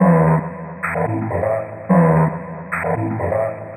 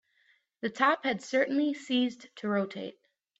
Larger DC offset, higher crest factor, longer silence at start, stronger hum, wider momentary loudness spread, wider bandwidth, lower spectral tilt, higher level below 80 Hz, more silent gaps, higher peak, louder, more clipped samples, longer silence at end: neither; about the same, 16 dB vs 18 dB; second, 0 s vs 0.65 s; neither; about the same, 11 LU vs 12 LU; first, 9.2 kHz vs 8.2 kHz; first, -11.5 dB/octave vs -5 dB/octave; first, -46 dBFS vs -78 dBFS; neither; first, -2 dBFS vs -12 dBFS; first, -19 LUFS vs -30 LUFS; neither; second, 0 s vs 0.5 s